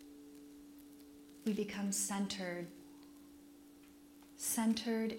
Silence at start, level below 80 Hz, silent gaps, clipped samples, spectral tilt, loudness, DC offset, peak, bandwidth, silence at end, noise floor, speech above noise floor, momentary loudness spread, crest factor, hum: 0 s; -74 dBFS; none; under 0.1%; -3.5 dB/octave; -38 LUFS; under 0.1%; -24 dBFS; 16.5 kHz; 0 s; -60 dBFS; 22 dB; 24 LU; 18 dB; none